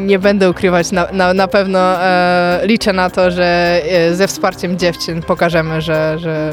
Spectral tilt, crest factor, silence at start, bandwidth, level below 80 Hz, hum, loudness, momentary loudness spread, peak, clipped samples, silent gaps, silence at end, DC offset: -5.5 dB/octave; 12 dB; 0 s; 17 kHz; -38 dBFS; none; -13 LUFS; 5 LU; -2 dBFS; under 0.1%; none; 0 s; under 0.1%